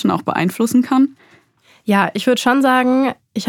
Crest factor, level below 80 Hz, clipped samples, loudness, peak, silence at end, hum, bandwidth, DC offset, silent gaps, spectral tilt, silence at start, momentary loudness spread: 16 dB; -64 dBFS; under 0.1%; -16 LUFS; 0 dBFS; 0 s; none; 17.5 kHz; under 0.1%; none; -5 dB/octave; 0 s; 6 LU